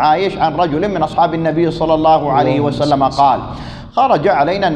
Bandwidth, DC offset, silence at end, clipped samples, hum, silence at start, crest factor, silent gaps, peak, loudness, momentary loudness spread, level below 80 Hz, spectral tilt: 9.6 kHz; under 0.1%; 0 s; under 0.1%; none; 0 s; 12 dB; none; 0 dBFS; -14 LUFS; 5 LU; -38 dBFS; -7 dB/octave